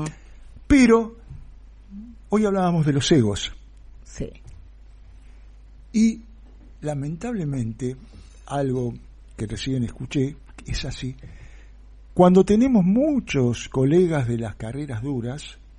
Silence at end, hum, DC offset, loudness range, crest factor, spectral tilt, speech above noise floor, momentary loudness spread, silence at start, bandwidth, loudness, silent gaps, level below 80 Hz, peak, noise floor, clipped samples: 0.25 s; none; under 0.1%; 10 LU; 20 dB; -6.5 dB/octave; 24 dB; 19 LU; 0 s; 11 kHz; -22 LUFS; none; -42 dBFS; -2 dBFS; -45 dBFS; under 0.1%